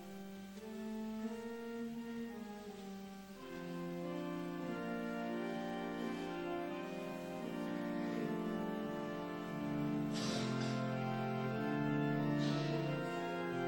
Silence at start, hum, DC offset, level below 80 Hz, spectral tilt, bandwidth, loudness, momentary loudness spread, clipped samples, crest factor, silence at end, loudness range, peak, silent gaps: 0 s; none; under 0.1%; -70 dBFS; -6.5 dB/octave; 17 kHz; -41 LUFS; 12 LU; under 0.1%; 16 dB; 0 s; 8 LU; -26 dBFS; none